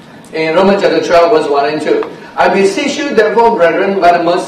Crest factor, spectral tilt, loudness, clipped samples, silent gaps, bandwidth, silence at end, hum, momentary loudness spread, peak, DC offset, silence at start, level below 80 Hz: 10 dB; -5 dB/octave; -10 LUFS; 0.4%; none; 12.5 kHz; 0 s; none; 6 LU; 0 dBFS; under 0.1%; 0.15 s; -46 dBFS